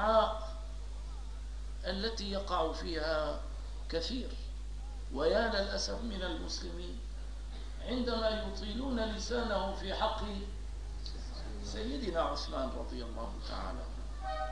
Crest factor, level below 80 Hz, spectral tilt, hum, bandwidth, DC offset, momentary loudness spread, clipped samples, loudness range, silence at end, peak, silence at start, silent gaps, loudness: 22 dB; -42 dBFS; -5 dB/octave; 50 Hz at -65 dBFS; 10.5 kHz; 0.3%; 12 LU; under 0.1%; 3 LU; 0 s; -14 dBFS; 0 s; none; -37 LUFS